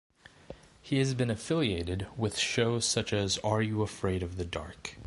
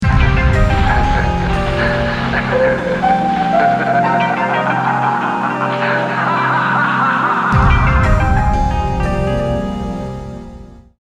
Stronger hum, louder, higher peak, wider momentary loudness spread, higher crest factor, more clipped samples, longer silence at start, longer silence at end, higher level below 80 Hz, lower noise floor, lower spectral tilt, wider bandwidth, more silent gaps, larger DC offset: neither; second, -31 LUFS vs -15 LUFS; second, -12 dBFS vs 0 dBFS; first, 13 LU vs 5 LU; first, 20 dB vs 14 dB; neither; first, 0.5 s vs 0 s; second, 0 s vs 0.25 s; second, -50 dBFS vs -20 dBFS; first, -51 dBFS vs -35 dBFS; second, -4.5 dB/octave vs -7 dB/octave; first, 11.5 kHz vs 10 kHz; neither; neither